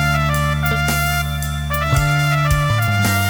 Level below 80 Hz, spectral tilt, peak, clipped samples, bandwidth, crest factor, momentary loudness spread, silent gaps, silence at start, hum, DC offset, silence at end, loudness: -26 dBFS; -5 dB/octave; -4 dBFS; under 0.1%; over 20 kHz; 12 dB; 4 LU; none; 0 s; none; under 0.1%; 0 s; -17 LUFS